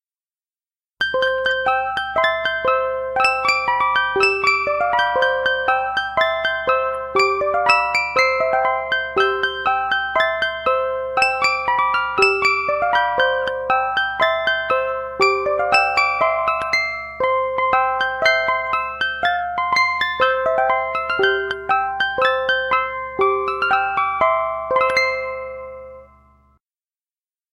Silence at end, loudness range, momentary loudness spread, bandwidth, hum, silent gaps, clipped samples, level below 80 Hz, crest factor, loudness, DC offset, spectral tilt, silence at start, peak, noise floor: 1.5 s; 2 LU; 5 LU; 14 kHz; none; none; under 0.1%; -50 dBFS; 18 dB; -18 LUFS; under 0.1%; -2.5 dB/octave; 1 s; 0 dBFS; under -90 dBFS